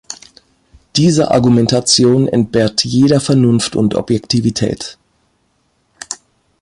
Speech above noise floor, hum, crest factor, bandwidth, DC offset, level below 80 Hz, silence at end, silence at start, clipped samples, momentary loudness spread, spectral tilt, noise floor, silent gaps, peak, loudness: 49 dB; none; 14 dB; 11.5 kHz; under 0.1%; -44 dBFS; 0.45 s; 0.1 s; under 0.1%; 17 LU; -5 dB/octave; -61 dBFS; none; 0 dBFS; -13 LUFS